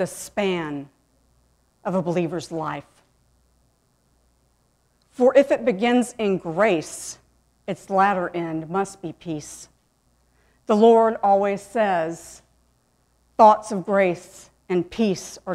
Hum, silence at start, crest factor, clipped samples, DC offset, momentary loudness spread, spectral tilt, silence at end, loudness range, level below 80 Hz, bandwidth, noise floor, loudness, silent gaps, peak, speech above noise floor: none; 0 s; 22 dB; under 0.1%; under 0.1%; 19 LU; -5.5 dB/octave; 0 s; 9 LU; -60 dBFS; 14.5 kHz; -65 dBFS; -21 LUFS; none; -2 dBFS; 44 dB